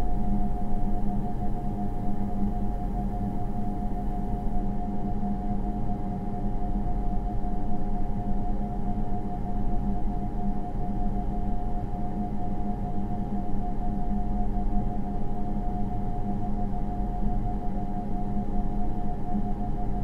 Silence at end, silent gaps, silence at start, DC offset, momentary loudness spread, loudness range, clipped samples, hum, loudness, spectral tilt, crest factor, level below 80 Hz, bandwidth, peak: 0 s; none; 0 s; under 0.1%; 2 LU; 1 LU; under 0.1%; none; -32 LUFS; -10 dB/octave; 12 dB; -30 dBFS; 3.1 kHz; -12 dBFS